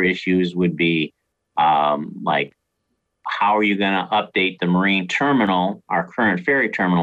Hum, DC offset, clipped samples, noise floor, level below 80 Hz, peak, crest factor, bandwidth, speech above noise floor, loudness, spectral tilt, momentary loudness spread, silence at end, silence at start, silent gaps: none; under 0.1%; under 0.1%; -73 dBFS; -58 dBFS; -8 dBFS; 10 dB; 8 kHz; 54 dB; -19 LUFS; -6.5 dB/octave; 6 LU; 0 s; 0 s; none